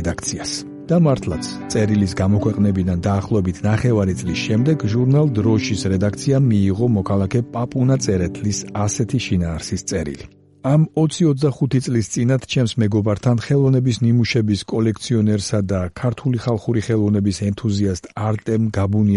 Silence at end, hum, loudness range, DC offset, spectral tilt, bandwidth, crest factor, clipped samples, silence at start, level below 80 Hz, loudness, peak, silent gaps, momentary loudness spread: 0 s; none; 3 LU; under 0.1%; -6.5 dB/octave; 11.5 kHz; 14 dB; under 0.1%; 0 s; -44 dBFS; -19 LUFS; -4 dBFS; none; 7 LU